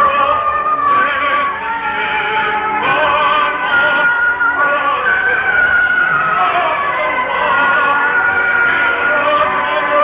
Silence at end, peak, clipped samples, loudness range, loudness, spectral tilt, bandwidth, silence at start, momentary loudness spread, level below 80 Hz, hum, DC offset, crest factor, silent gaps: 0 s; -2 dBFS; under 0.1%; 2 LU; -13 LUFS; -6.5 dB/octave; 4 kHz; 0 s; 4 LU; -46 dBFS; none; under 0.1%; 12 dB; none